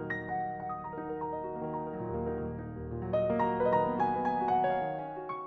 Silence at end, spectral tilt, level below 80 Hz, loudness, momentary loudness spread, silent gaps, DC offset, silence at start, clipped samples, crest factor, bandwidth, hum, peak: 0 s; -9 dB/octave; -54 dBFS; -33 LUFS; 10 LU; none; under 0.1%; 0 s; under 0.1%; 16 dB; 6.4 kHz; none; -18 dBFS